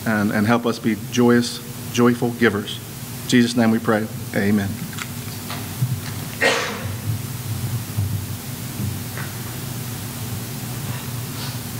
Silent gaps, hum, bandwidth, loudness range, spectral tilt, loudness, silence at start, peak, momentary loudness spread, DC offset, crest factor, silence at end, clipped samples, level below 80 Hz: none; none; 16 kHz; 8 LU; -5 dB/octave; -22 LUFS; 0 s; -2 dBFS; 11 LU; under 0.1%; 20 dB; 0 s; under 0.1%; -50 dBFS